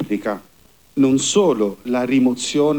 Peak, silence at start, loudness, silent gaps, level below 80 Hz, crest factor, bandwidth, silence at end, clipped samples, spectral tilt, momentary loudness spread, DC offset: -4 dBFS; 0 s; -18 LUFS; none; -58 dBFS; 14 dB; 19.5 kHz; 0 s; under 0.1%; -4.5 dB/octave; 11 LU; 0.2%